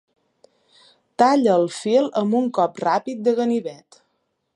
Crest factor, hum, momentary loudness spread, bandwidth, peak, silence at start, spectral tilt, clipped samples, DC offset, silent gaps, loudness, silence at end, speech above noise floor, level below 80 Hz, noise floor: 18 dB; none; 7 LU; 11 kHz; -2 dBFS; 1.2 s; -5.5 dB/octave; under 0.1%; under 0.1%; none; -20 LUFS; 0.8 s; 53 dB; -74 dBFS; -72 dBFS